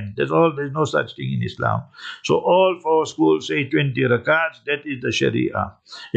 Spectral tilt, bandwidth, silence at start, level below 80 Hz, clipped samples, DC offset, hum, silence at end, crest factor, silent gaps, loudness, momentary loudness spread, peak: -6 dB/octave; 8.6 kHz; 0 s; -58 dBFS; under 0.1%; under 0.1%; none; 0 s; 16 dB; none; -20 LUFS; 9 LU; -4 dBFS